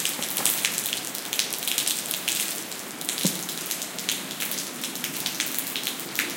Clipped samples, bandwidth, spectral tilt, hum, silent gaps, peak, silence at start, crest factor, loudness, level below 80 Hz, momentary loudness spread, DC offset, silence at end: under 0.1%; 17.5 kHz; -0.5 dB/octave; none; none; 0 dBFS; 0 s; 28 dB; -26 LUFS; -74 dBFS; 6 LU; under 0.1%; 0 s